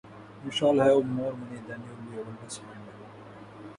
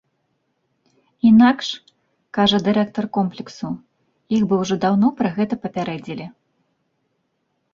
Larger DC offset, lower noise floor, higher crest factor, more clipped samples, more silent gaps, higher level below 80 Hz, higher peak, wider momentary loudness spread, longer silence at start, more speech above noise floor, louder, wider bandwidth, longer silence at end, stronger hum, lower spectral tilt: neither; second, -47 dBFS vs -71 dBFS; about the same, 20 dB vs 18 dB; neither; neither; second, -66 dBFS vs -56 dBFS; second, -10 dBFS vs -2 dBFS; first, 25 LU vs 17 LU; second, 0.05 s vs 1.25 s; second, 19 dB vs 53 dB; second, -26 LUFS vs -19 LUFS; first, 11 kHz vs 7.4 kHz; second, 0 s vs 1.45 s; neither; about the same, -5.5 dB/octave vs -6 dB/octave